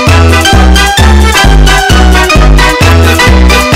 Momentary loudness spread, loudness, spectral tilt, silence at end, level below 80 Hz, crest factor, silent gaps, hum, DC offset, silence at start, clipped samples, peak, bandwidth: 1 LU; -4 LUFS; -4.5 dB/octave; 0 s; -6 dBFS; 4 dB; none; none; 1%; 0 s; 8%; 0 dBFS; 16 kHz